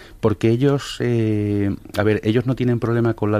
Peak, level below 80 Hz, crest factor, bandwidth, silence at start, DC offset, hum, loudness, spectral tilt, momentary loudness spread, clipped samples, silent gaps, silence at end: -2 dBFS; -46 dBFS; 18 dB; 15 kHz; 0 s; under 0.1%; none; -20 LUFS; -7.5 dB/octave; 4 LU; under 0.1%; none; 0 s